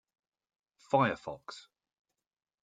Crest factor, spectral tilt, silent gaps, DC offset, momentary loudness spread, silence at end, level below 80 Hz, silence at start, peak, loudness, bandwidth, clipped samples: 24 dB; -6.5 dB/octave; none; under 0.1%; 20 LU; 1.05 s; -74 dBFS; 0.9 s; -14 dBFS; -31 LUFS; 9.2 kHz; under 0.1%